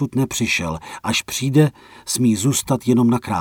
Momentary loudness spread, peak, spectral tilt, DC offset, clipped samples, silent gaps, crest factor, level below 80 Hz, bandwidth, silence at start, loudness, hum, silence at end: 8 LU; -4 dBFS; -5 dB/octave; under 0.1%; under 0.1%; none; 14 dB; -48 dBFS; 17.5 kHz; 0 s; -19 LUFS; none; 0 s